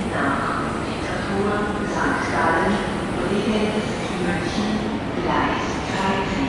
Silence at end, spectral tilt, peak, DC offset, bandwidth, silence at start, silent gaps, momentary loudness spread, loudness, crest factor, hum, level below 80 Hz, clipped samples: 0 s; -5.5 dB/octave; -8 dBFS; under 0.1%; 11.5 kHz; 0 s; none; 4 LU; -22 LUFS; 14 dB; none; -40 dBFS; under 0.1%